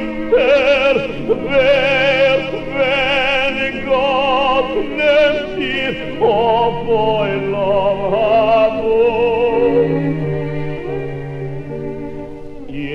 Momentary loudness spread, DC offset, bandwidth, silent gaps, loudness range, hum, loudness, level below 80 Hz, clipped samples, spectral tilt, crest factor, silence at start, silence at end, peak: 13 LU; under 0.1%; 8.4 kHz; none; 3 LU; none; -15 LUFS; -36 dBFS; under 0.1%; -6.5 dB/octave; 14 dB; 0 s; 0 s; -2 dBFS